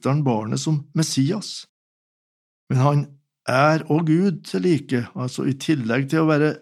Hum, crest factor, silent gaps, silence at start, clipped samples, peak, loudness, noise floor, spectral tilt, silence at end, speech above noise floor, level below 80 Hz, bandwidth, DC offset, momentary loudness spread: none; 18 dB; 1.69-2.67 s; 0.05 s; under 0.1%; -2 dBFS; -21 LUFS; under -90 dBFS; -6 dB/octave; 0.05 s; over 70 dB; -76 dBFS; 13 kHz; under 0.1%; 9 LU